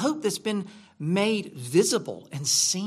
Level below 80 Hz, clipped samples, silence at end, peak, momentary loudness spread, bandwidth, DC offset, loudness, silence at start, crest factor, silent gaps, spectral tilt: -74 dBFS; under 0.1%; 0 s; -8 dBFS; 12 LU; 15 kHz; under 0.1%; -25 LUFS; 0 s; 18 dB; none; -3.5 dB/octave